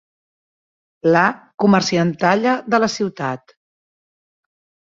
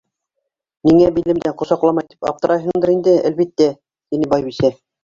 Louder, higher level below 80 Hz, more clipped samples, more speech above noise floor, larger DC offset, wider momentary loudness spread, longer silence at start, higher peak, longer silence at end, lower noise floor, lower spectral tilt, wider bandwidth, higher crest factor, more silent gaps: about the same, -17 LUFS vs -16 LUFS; second, -60 dBFS vs -48 dBFS; neither; first, over 73 dB vs 61 dB; neither; about the same, 9 LU vs 8 LU; first, 1.05 s vs 0.85 s; about the same, -2 dBFS vs -2 dBFS; first, 1.55 s vs 0.3 s; first, under -90 dBFS vs -77 dBFS; second, -5.5 dB/octave vs -7.5 dB/octave; about the same, 7.6 kHz vs 7.4 kHz; about the same, 18 dB vs 16 dB; first, 1.54-1.58 s vs none